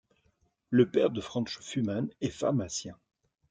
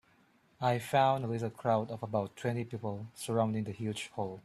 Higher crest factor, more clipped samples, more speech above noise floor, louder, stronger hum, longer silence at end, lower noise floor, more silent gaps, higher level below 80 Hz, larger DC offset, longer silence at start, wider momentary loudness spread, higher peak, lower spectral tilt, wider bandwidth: about the same, 22 dB vs 20 dB; neither; first, 43 dB vs 34 dB; first, -30 LUFS vs -34 LUFS; neither; first, 0.55 s vs 0.05 s; first, -72 dBFS vs -67 dBFS; neither; about the same, -66 dBFS vs -70 dBFS; neither; about the same, 0.7 s vs 0.6 s; about the same, 10 LU vs 11 LU; first, -10 dBFS vs -14 dBFS; about the same, -5.5 dB/octave vs -6 dB/octave; second, 9.4 kHz vs 14 kHz